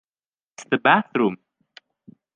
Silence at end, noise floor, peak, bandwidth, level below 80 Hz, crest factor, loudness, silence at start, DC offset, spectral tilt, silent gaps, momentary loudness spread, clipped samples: 1 s; under -90 dBFS; -2 dBFS; 9.6 kHz; -70 dBFS; 22 dB; -20 LUFS; 0.6 s; under 0.1%; -5.5 dB/octave; none; 10 LU; under 0.1%